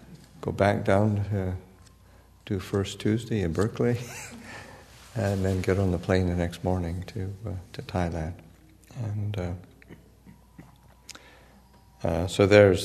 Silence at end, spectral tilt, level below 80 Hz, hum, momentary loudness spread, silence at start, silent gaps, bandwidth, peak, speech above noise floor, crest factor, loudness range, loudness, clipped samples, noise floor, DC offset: 0 s; -6.5 dB/octave; -48 dBFS; none; 19 LU; 0.1 s; none; 13.5 kHz; -2 dBFS; 30 dB; 24 dB; 10 LU; -27 LUFS; under 0.1%; -55 dBFS; under 0.1%